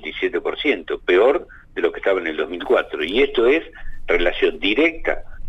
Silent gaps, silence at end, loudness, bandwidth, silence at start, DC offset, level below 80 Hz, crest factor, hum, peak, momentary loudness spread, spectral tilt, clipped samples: none; 0 s; -20 LUFS; 8 kHz; 0 s; under 0.1%; -36 dBFS; 14 dB; none; -6 dBFS; 9 LU; -5 dB/octave; under 0.1%